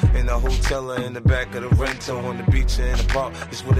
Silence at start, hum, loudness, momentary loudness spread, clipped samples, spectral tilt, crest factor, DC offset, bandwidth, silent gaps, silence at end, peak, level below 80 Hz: 0 s; none; -22 LUFS; 6 LU; under 0.1%; -6 dB/octave; 14 dB; under 0.1%; 13.5 kHz; none; 0 s; -6 dBFS; -24 dBFS